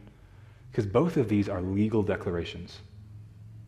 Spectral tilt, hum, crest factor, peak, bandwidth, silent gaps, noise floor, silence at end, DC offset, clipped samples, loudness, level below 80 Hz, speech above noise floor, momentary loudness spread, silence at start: -8 dB/octave; none; 20 dB; -10 dBFS; 12 kHz; none; -52 dBFS; 0 s; under 0.1%; under 0.1%; -28 LUFS; -56 dBFS; 24 dB; 23 LU; 0 s